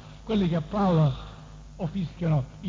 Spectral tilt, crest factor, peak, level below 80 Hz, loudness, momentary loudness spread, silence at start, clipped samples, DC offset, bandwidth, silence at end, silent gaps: -9 dB/octave; 14 dB; -12 dBFS; -46 dBFS; -27 LUFS; 20 LU; 0 s; under 0.1%; under 0.1%; 7.4 kHz; 0 s; none